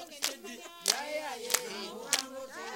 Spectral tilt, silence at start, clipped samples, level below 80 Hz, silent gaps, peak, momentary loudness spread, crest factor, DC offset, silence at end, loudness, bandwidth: 0.5 dB/octave; 0 s; under 0.1%; -80 dBFS; none; -4 dBFS; 12 LU; 32 dB; under 0.1%; 0 s; -33 LUFS; 17 kHz